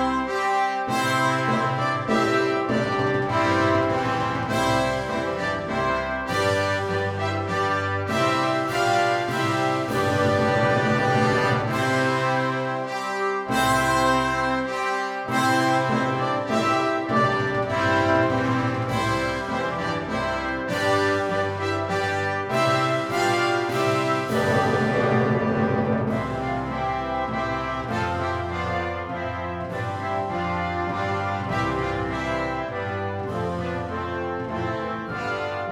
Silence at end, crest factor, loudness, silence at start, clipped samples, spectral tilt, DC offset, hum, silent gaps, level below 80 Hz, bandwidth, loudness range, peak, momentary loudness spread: 0 s; 16 dB; -23 LUFS; 0 s; under 0.1%; -5.5 dB/octave; under 0.1%; none; none; -48 dBFS; 18.5 kHz; 5 LU; -8 dBFS; 7 LU